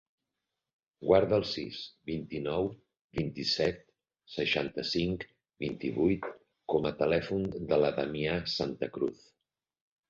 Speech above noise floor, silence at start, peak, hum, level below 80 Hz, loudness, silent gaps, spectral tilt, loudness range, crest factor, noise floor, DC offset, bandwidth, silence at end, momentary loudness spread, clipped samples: 57 dB; 1 s; -10 dBFS; none; -56 dBFS; -32 LUFS; 3.01-3.09 s; -6 dB/octave; 3 LU; 22 dB; -88 dBFS; under 0.1%; 7.6 kHz; 0.95 s; 12 LU; under 0.1%